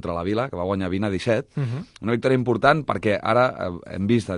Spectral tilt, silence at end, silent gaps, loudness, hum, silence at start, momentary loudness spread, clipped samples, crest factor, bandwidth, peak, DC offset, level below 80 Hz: -7 dB/octave; 0 s; none; -23 LUFS; none; 0.05 s; 10 LU; under 0.1%; 20 dB; 11 kHz; -4 dBFS; under 0.1%; -46 dBFS